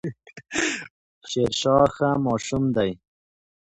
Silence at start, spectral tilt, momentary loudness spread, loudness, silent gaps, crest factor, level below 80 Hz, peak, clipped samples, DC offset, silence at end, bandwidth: 0.05 s; -5 dB/octave; 15 LU; -23 LUFS; 0.90-1.21 s; 20 dB; -52 dBFS; -4 dBFS; under 0.1%; under 0.1%; 0.75 s; 11 kHz